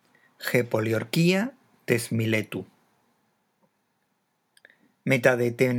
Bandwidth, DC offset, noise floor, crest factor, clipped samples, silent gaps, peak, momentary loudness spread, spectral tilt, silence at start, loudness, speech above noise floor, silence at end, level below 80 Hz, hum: 19.5 kHz; under 0.1%; -73 dBFS; 22 dB; under 0.1%; none; -6 dBFS; 13 LU; -5.5 dB/octave; 0.4 s; -25 LUFS; 50 dB; 0 s; -76 dBFS; none